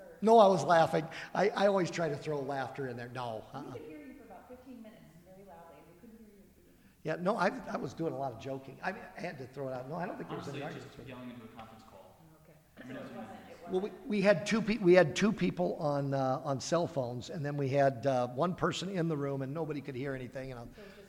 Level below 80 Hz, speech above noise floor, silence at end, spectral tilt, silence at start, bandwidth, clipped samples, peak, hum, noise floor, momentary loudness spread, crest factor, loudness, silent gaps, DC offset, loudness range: -64 dBFS; 30 dB; 0.05 s; -6 dB/octave; 0 s; 16.5 kHz; under 0.1%; -10 dBFS; none; -62 dBFS; 22 LU; 24 dB; -32 LUFS; none; under 0.1%; 16 LU